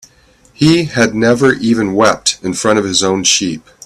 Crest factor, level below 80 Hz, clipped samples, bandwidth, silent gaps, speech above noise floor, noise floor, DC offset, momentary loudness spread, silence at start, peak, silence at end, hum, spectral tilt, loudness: 14 dB; -46 dBFS; under 0.1%; 14.5 kHz; none; 36 dB; -48 dBFS; under 0.1%; 4 LU; 0.6 s; 0 dBFS; 0.25 s; none; -3.5 dB/octave; -12 LUFS